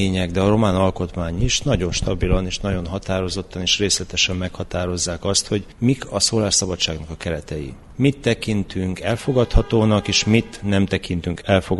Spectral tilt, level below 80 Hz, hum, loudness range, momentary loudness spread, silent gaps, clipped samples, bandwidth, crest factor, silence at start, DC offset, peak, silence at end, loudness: -4.5 dB/octave; -30 dBFS; none; 2 LU; 9 LU; none; under 0.1%; 11.5 kHz; 18 dB; 0 s; under 0.1%; -2 dBFS; 0 s; -20 LUFS